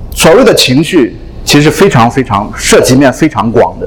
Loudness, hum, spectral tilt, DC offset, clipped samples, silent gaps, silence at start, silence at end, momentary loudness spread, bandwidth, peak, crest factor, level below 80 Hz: -6 LUFS; none; -4.5 dB/octave; under 0.1%; 6%; none; 0 s; 0 s; 7 LU; 19.5 kHz; 0 dBFS; 6 dB; -26 dBFS